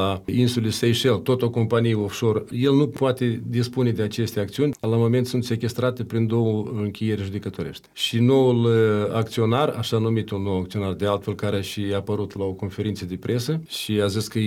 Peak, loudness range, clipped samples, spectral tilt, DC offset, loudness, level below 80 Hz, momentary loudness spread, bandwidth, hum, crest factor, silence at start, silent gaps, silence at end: -8 dBFS; 5 LU; under 0.1%; -6.5 dB/octave; under 0.1%; -23 LUFS; -56 dBFS; 8 LU; 16 kHz; none; 16 dB; 0 s; none; 0 s